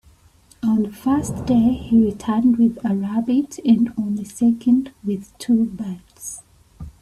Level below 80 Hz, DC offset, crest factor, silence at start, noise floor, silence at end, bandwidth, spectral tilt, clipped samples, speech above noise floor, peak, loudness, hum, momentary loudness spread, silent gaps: -48 dBFS; under 0.1%; 14 dB; 0.65 s; -53 dBFS; 0.1 s; 13 kHz; -7 dB/octave; under 0.1%; 34 dB; -4 dBFS; -20 LUFS; none; 14 LU; none